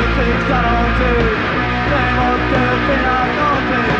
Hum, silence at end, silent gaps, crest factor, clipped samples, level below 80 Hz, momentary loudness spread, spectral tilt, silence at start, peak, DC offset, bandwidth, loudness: none; 0 s; none; 12 dB; under 0.1%; -24 dBFS; 1 LU; -7 dB/octave; 0 s; -4 dBFS; under 0.1%; 7.8 kHz; -15 LUFS